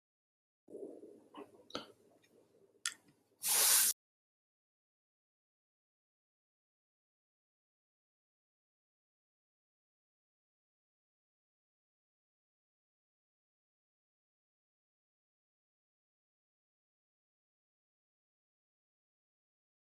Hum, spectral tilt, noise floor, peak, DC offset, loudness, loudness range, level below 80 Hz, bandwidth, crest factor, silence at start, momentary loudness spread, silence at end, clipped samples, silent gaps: none; 2 dB/octave; -69 dBFS; -14 dBFS; under 0.1%; -31 LUFS; 15 LU; under -90 dBFS; 13.5 kHz; 32 dB; 0.7 s; 25 LU; 15.95 s; under 0.1%; none